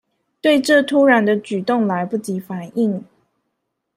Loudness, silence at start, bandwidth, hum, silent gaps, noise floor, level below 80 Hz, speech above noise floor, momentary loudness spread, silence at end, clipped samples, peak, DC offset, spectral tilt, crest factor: -17 LUFS; 0.45 s; 16 kHz; none; none; -75 dBFS; -66 dBFS; 58 dB; 13 LU; 0.95 s; under 0.1%; -2 dBFS; under 0.1%; -5.5 dB/octave; 16 dB